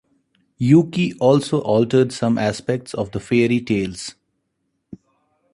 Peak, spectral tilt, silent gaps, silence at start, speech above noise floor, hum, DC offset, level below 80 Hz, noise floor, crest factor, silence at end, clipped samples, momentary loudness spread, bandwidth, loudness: -2 dBFS; -6.5 dB/octave; none; 0.6 s; 55 dB; none; under 0.1%; -52 dBFS; -73 dBFS; 18 dB; 1.4 s; under 0.1%; 11 LU; 11.5 kHz; -19 LUFS